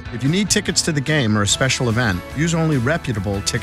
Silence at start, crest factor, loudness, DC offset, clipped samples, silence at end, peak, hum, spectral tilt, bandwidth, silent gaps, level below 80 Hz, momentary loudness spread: 0 s; 16 dB; -18 LUFS; under 0.1%; under 0.1%; 0 s; -2 dBFS; none; -4 dB/octave; 15.5 kHz; none; -38 dBFS; 5 LU